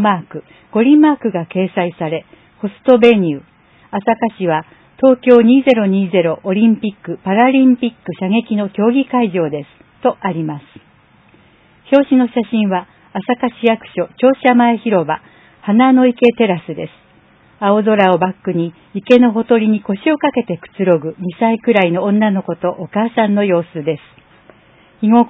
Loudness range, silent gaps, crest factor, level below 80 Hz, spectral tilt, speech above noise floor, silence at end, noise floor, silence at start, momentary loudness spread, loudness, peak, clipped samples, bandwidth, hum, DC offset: 5 LU; none; 14 dB; -58 dBFS; -9 dB/octave; 36 dB; 0 s; -49 dBFS; 0 s; 13 LU; -14 LUFS; 0 dBFS; under 0.1%; 4 kHz; none; under 0.1%